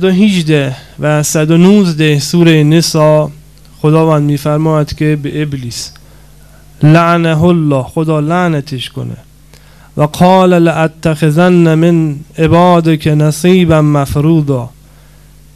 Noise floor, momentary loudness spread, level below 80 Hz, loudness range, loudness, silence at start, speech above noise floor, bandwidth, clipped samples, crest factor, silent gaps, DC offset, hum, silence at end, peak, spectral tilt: -39 dBFS; 12 LU; -36 dBFS; 4 LU; -10 LUFS; 0 s; 30 dB; 14 kHz; 0.6%; 10 dB; none; 0.4%; none; 0.9 s; 0 dBFS; -6.5 dB/octave